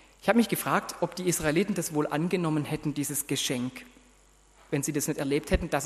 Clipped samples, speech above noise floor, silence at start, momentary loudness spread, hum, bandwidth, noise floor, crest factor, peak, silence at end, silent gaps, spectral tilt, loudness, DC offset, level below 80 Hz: under 0.1%; 31 dB; 0.25 s; 7 LU; none; 13 kHz; -59 dBFS; 22 dB; -6 dBFS; 0 s; none; -4.5 dB/octave; -28 LUFS; under 0.1%; -46 dBFS